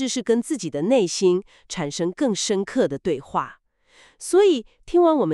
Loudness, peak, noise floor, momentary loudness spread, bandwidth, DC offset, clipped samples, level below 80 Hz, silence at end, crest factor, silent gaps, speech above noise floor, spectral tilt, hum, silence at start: -22 LUFS; -8 dBFS; -56 dBFS; 10 LU; 12 kHz; under 0.1%; under 0.1%; -56 dBFS; 0 s; 14 dB; none; 35 dB; -4.5 dB/octave; none; 0 s